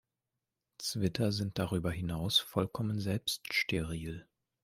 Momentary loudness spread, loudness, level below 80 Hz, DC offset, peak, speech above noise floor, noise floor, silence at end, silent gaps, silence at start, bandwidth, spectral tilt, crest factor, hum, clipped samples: 10 LU; -34 LUFS; -58 dBFS; under 0.1%; -14 dBFS; 55 dB; -89 dBFS; 0.4 s; none; 0.8 s; 16 kHz; -4.5 dB/octave; 20 dB; none; under 0.1%